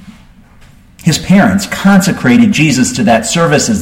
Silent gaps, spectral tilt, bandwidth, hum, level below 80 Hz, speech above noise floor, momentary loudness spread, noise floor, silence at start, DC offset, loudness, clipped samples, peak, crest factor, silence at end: none; -5 dB/octave; 16.5 kHz; none; -38 dBFS; 31 dB; 4 LU; -39 dBFS; 0.05 s; under 0.1%; -9 LUFS; under 0.1%; 0 dBFS; 10 dB; 0 s